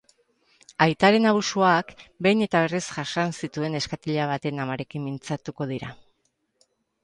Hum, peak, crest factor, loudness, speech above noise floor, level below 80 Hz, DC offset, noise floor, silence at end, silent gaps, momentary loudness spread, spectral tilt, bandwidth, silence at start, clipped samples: none; -4 dBFS; 22 dB; -24 LUFS; 48 dB; -62 dBFS; under 0.1%; -72 dBFS; 1.1 s; none; 13 LU; -5 dB/octave; 11 kHz; 0.8 s; under 0.1%